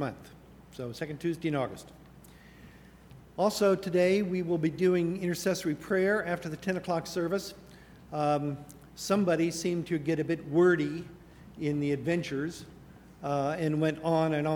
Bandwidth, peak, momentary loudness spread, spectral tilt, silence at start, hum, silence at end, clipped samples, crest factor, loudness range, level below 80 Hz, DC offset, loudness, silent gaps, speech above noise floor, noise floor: 19.5 kHz; -14 dBFS; 15 LU; -6 dB/octave; 0 s; none; 0 s; under 0.1%; 16 dB; 4 LU; -60 dBFS; under 0.1%; -30 LUFS; none; 24 dB; -53 dBFS